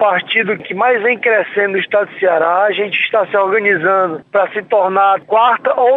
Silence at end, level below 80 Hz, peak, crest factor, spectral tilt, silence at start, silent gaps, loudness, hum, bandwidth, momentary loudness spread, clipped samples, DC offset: 0 s; -68 dBFS; -2 dBFS; 12 dB; -6.5 dB/octave; 0 s; none; -13 LUFS; none; 4.1 kHz; 4 LU; under 0.1%; under 0.1%